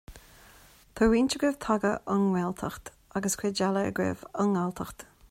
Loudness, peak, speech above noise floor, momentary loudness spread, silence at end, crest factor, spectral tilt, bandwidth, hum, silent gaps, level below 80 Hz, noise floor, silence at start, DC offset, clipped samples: -28 LUFS; -12 dBFS; 28 dB; 14 LU; 0.25 s; 18 dB; -5 dB/octave; 16 kHz; none; none; -52 dBFS; -56 dBFS; 0.1 s; under 0.1%; under 0.1%